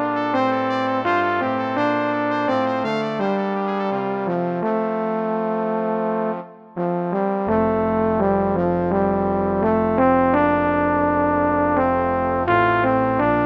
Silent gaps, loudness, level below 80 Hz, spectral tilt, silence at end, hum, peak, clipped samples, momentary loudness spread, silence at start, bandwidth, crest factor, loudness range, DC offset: none; -20 LUFS; -46 dBFS; -8.5 dB/octave; 0 s; none; -2 dBFS; under 0.1%; 5 LU; 0 s; 7.4 kHz; 18 dB; 4 LU; under 0.1%